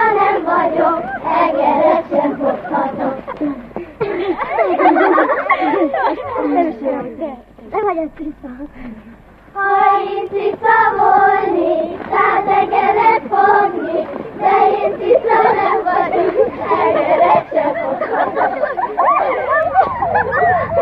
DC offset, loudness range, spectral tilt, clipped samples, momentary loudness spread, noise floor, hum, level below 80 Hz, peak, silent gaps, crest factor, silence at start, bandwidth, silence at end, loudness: under 0.1%; 6 LU; -8 dB/octave; under 0.1%; 11 LU; -40 dBFS; none; -48 dBFS; 0 dBFS; none; 14 dB; 0 s; 5.4 kHz; 0 s; -15 LUFS